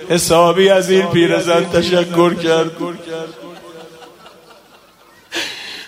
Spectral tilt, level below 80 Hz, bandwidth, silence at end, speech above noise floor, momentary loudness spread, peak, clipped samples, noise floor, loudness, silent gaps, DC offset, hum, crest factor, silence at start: -4.5 dB/octave; -50 dBFS; 16 kHz; 0 s; 33 dB; 17 LU; 0 dBFS; under 0.1%; -47 dBFS; -14 LUFS; none; under 0.1%; none; 16 dB; 0 s